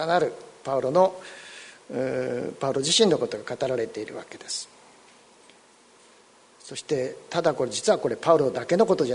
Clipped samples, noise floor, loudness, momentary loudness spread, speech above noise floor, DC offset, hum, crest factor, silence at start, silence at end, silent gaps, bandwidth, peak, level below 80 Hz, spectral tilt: under 0.1%; -56 dBFS; -25 LUFS; 17 LU; 31 dB; under 0.1%; none; 20 dB; 0 s; 0 s; none; 11 kHz; -6 dBFS; -66 dBFS; -4 dB/octave